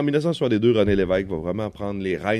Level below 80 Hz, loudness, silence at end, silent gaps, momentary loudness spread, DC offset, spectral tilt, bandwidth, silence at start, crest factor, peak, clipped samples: -44 dBFS; -22 LUFS; 0 s; none; 9 LU; under 0.1%; -7.5 dB/octave; 11.5 kHz; 0 s; 14 dB; -6 dBFS; under 0.1%